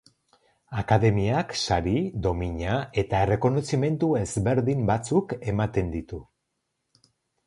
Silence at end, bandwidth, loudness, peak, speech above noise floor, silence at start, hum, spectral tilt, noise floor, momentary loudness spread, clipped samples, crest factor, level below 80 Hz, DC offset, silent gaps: 1.25 s; 11.5 kHz; -25 LUFS; -6 dBFS; 54 dB; 0.7 s; none; -6.5 dB/octave; -79 dBFS; 8 LU; under 0.1%; 20 dB; -42 dBFS; under 0.1%; none